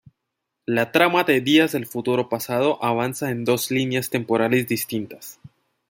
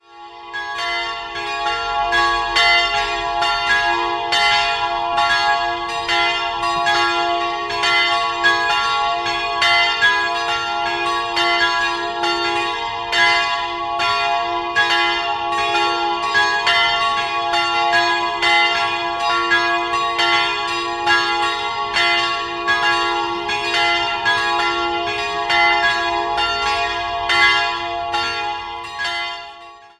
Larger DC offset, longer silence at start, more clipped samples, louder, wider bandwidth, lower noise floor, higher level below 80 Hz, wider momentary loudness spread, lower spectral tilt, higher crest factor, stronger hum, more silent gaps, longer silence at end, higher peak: neither; first, 0.7 s vs 0.1 s; neither; second, -21 LUFS vs -17 LUFS; first, 17 kHz vs 14 kHz; first, -80 dBFS vs -40 dBFS; second, -64 dBFS vs -46 dBFS; first, 11 LU vs 7 LU; first, -4.5 dB/octave vs -1.5 dB/octave; about the same, 20 dB vs 16 dB; neither; neither; first, 0.45 s vs 0.1 s; about the same, -2 dBFS vs -2 dBFS